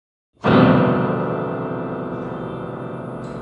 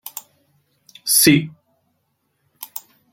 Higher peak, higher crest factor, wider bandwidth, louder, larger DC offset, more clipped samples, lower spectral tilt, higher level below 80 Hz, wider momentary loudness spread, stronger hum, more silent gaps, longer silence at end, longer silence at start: about the same, 0 dBFS vs -2 dBFS; about the same, 20 dB vs 22 dB; second, 5.8 kHz vs 17 kHz; second, -20 LUFS vs -15 LUFS; neither; neither; first, -9 dB/octave vs -3 dB/octave; first, -50 dBFS vs -60 dBFS; second, 16 LU vs 23 LU; neither; neither; second, 0 s vs 0.35 s; first, 0.45 s vs 0.05 s